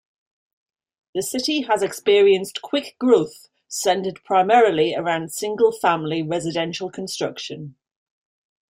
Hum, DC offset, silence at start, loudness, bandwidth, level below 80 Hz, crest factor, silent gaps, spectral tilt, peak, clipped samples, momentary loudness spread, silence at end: none; under 0.1%; 1.15 s; -20 LUFS; 16.5 kHz; -66 dBFS; 18 dB; none; -4 dB/octave; -4 dBFS; under 0.1%; 14 LU; 1 s